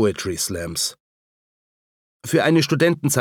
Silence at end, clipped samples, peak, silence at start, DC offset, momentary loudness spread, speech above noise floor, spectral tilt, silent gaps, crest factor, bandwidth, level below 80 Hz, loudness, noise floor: 0 s; under 0.1%; -4 dBFS; 0 s; under 0.1%; 8 LU; over 70 dB; -4.5 dB/octave; 1.00-2.20 s; 18 dB; 19 kHz; -52 dBFS; -20 LUFS; under -90 dBFS